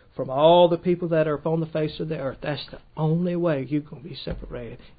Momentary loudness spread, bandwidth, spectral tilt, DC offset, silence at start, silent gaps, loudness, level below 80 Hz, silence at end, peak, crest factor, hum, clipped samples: 18 LU; 5 kHz; -11.5 dB/octave; under 0.1%; 0.15 s; none; -23 LUFS; -48 dBFS; 0.1 s; -4 dBFS; 18 dB; none; under 0.1%